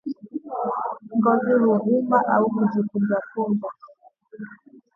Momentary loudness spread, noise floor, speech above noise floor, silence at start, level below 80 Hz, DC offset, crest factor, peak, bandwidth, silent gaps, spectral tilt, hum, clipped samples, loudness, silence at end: 17 LU; -51 dBFS; 30 dB; 0.05 s; -72 dBFS; under 0.1%; 18 dB; -6 dBFS; 5.2 kHz; none; -11 dB/octave; none; under 0.1%; -22 LUFS; 0.4 s